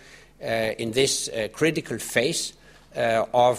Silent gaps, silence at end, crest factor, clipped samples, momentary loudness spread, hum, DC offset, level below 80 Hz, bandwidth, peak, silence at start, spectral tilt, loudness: none; 0 s; 20 dB; under 0.1%; 8 LU; none; under 0.1%; -56 dBFS; 15.5 kHz; -4 dBFS; 0.1 s; -3 dB/octave; -24 LUFS